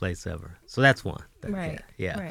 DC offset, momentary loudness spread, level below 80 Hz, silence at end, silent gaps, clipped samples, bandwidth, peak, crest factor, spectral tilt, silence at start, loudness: under 0.1%; 16 LU; -48 dBFS; 0 s; none; under 0.1%; 15.5 kHz; -6 dBFS; 22 dB; -5.5 dB/octave; 0 s; -27 LUFS